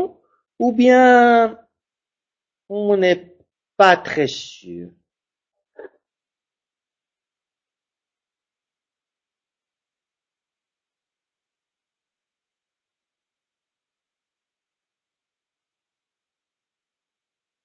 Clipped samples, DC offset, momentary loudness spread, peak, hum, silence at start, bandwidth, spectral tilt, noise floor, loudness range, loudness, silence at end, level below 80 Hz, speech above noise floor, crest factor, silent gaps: under 0.1%; under 0.1%; 22 LU; 0 dBFS; none; 0 s; 7.6 kHz; -5 dB/octave; under -90 dBFS; 8 LU; -15 LUFS; 11.8 s; -68 dBFS; over 75 dB; 22 dB; none